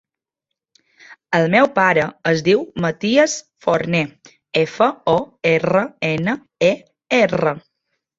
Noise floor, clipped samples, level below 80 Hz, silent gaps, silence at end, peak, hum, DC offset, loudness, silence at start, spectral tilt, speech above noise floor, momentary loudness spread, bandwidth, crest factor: -82 dBFS; under 0.1%; -56 dBFS; none; 0.6 s; -2 dBFS; none; under 0.1%; -18 LUFS; 1.1 s; -5 dB/octave; 65 dB; 8 LU; 7.8 kHz; 18 dB